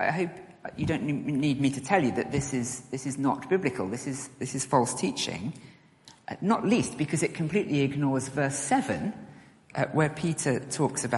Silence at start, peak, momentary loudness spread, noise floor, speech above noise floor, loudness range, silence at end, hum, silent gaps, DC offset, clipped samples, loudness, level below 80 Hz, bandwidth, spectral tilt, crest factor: 0 s; -8 dBFS; 10 LU; -56 dBFS; 28 dB; 2 LU; 0 s; none; none; under 0.1%; under 0.1%; -28 LUFS; -60 dBFS; 11.5 kHz; -5 dB/octave; 20 dB